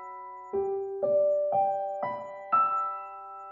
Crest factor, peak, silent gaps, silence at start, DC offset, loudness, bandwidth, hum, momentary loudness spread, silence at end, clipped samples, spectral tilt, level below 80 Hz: 14 dB; -14 dBFS; none; 0 s; under 0.1%; -29 LUFS; 3.4 kHz; none; 16 LU; 0 s; under 0.1%; -8 dB/octave; -72 dBFS